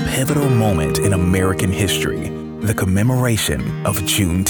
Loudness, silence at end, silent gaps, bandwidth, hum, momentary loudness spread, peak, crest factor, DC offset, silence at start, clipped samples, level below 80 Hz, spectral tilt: -18 LUFS; 0 s; none; over 20 kHz; none; 6 LU; -2 dBFS; 14 dB; under 0.1%; 0 s; under 0.1%; -36 dBFS; -5 dB/octave